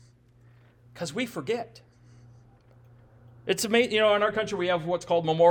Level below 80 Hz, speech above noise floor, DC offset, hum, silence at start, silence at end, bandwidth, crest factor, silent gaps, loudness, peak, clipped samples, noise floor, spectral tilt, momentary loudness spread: -64 dBFS; 32 dB; under 0.1%; 60 Hz at -60 dBFS; 0.95 s; 0 s; 18 kHz; 18 dB; none; -26 LUFS; -10 dBFS; under 0.1%; -57 dBFS; -4 dB/octave; 13 LU